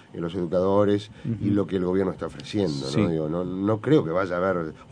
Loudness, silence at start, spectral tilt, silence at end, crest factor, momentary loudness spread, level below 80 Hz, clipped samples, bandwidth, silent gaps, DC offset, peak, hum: -25 LUFS; 0.15 s; -7.5 dB/octave; 0 s; 18 dB; 8 LU; -54 dBFS; under 0.1%; 10 kHz; none; under 0.1%; -8 dBFS; none